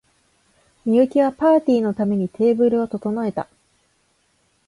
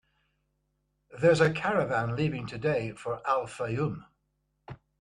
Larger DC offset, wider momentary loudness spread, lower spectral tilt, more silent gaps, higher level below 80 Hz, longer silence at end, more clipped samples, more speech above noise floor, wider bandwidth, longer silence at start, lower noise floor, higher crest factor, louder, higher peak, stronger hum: neither; second, 10 LU vs 17 LU; first, -8.5 dB/octave vs -6.5 dB/octave; neither; about the same, -60 dBFS vs -60 dBFS; first, 1.25 s vs 0.25 s; neither; about the same, 46 dB vs 49 dB; about the same, 11.5 kHz vs 11 kHz; second, 0.85 s vs 1.1 s; second, -64 dBFS vs -77 dBFS; second, 16 dB vs 22 dB; first, -19 LUFS vs -28 LUFS; first, -6 dBFS vs -10 dBFS; second, none vs 50 Hz at -55 dBFS